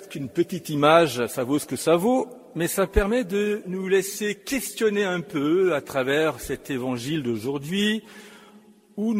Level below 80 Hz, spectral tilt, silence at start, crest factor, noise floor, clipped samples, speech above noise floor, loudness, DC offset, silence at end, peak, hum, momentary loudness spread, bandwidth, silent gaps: -42 dBFS; -5 dB/octave; 0 s; 22 dB; -52 dBFS; under 0.1%; 28 dB; -24 LUFS; under 0.1%; 0 s; -2 dBFS; none; 9 LU; 16 kHz; none